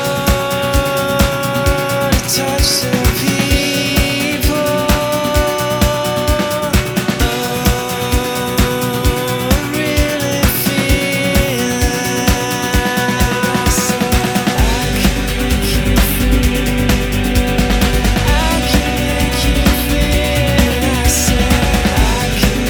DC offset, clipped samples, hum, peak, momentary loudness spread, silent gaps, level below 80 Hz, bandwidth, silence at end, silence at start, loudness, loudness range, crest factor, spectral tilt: under 0.1%; under 0.1%; none; 0 dBFS; 3 LU; none; -20 dBFS; over 20 kHz; 0 s; 0 s; -14 LUFS; 2 LU; 14 dB; -4.5 dB/octave